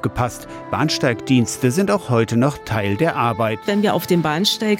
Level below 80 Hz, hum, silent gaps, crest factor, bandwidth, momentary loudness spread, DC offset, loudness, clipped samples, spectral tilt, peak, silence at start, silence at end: -46 dBFS; none; none; 14 dB; 17 kHz; 6 LU; under 0.1%; -19 LUFS; under 0.1%; -5 dB/octave; -6 dBFS; 0 s; 0 s